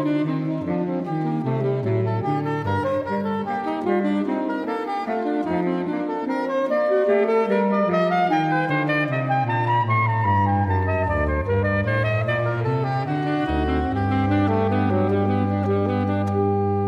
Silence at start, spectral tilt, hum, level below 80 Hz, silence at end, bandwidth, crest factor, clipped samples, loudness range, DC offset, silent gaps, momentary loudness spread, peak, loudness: 0 s; -9 dB/octave; none; -40 dBFS; 0 s; 6.8 kHz; 14 dB; under 0.1%; 4 LU; under 0.1%; none; 5 LU; -8 dBFS; -22 LUFS